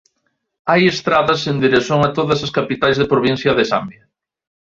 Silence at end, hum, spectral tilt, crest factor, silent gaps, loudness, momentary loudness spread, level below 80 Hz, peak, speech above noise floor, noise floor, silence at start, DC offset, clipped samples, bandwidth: 0.75 s; none; -5.5 dB/octave; 16 dB; none; -16 LUFS; 5 LU; -50 dBFS; -2 dBFS; 54 dB; -69 dBFS; 0.65 s; under 0.1%; under 0.1%; 7.6 kHz